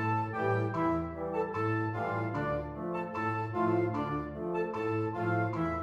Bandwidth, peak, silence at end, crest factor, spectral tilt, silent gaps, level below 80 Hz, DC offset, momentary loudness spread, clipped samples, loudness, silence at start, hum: 7.4 kHz; -18 dBFS; 0 s; 14 dB; -9 dB/octave; none; -54 dBFS; under 0.1%; 5 LU; under 0.1%; -33 LUFS; 0 s; none